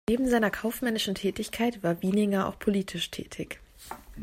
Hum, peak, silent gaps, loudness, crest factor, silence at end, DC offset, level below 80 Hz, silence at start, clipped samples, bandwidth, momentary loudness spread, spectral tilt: none; -10 dBFS; none; -28 LUFS; 18 dB; 0 s; under 0.1%; -52 dBFS; 0.1 s; under 0.1%; 16 kHz; 15 LU; -5 dB/octave